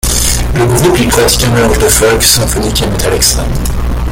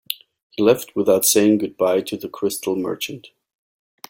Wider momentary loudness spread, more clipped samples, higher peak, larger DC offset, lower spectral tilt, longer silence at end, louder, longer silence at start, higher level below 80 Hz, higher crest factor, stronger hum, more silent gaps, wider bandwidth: second, 7 LU vs 15 LU; first, 0.2% vs under 0.1%; about the same, 0 dBFS vs 0 dBFS; neither; about the same, -3.5 dB/octave vs -3.5 dB/octave; second, 0 s vs 0.8 s; first, -9 LUFS vs -19 LUFS; about the same, 0.05 s vs 0.1 s; first, -16 dBFS vs -62 dBFS; second, 10 dB vs 20 dB; neither; second, none vs 0.42-0.50 s; first, over 20 kHz vs 17 kHz